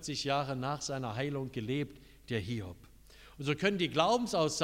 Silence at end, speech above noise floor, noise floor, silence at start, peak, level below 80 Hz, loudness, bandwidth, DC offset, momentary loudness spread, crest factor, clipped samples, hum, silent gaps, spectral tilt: 0 s; 23 dB; -56 dBFS; 0 s; -12 dBFS; -60 dBFS; -34 LUFS; 16 kHz; under 0.1%; 11 LU; 22 dB; under 0.1%; none; none; -4.5 dB/octave